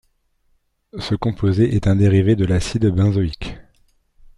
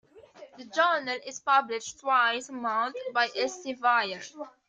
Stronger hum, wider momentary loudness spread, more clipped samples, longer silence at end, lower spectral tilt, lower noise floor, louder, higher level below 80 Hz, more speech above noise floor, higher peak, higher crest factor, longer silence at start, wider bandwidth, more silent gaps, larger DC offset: neither; first, 16 LU vs 10 LU; neither; first, 0.75 s vs 0.2 s; first, -7.5 dB/octave vs -1 dB/octave; first, -63 dBFS vs -51 dBFS; first, -18 LUFS vs -27 LUFS; first, -38 dBFS vs -78 dBFS; first, 47 dB vs 23 dB; first, -4 dBFS vs -10 dBFS; about the same, 14 dB vs 18 dB; first, 0.95 s vs 0.15 s; first, 11 kHz vs 9.6 kHz; neither; neither